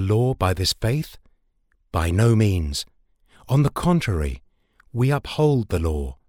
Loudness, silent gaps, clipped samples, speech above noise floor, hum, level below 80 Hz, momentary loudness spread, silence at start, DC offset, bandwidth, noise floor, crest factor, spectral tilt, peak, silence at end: -22 LUFS; none; under 0.1%; 45 dB; none; -34 dBFS; 11 LU; 0 s; under 0.1%; 16.5 kHz; -65 dBFS; 16 dB; -6 dB/octave; -6 dBFS; 0.15 s